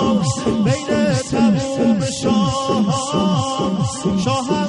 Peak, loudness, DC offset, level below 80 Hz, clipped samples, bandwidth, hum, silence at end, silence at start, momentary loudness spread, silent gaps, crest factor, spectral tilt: -4 dBFS; -18 LUFS; under 0.1%; -44 dBFS; under 0.1%; 11.5 kHz; none; 0 s; 0 s; 3 LU; none; 12 dB; -5.5 dB/octave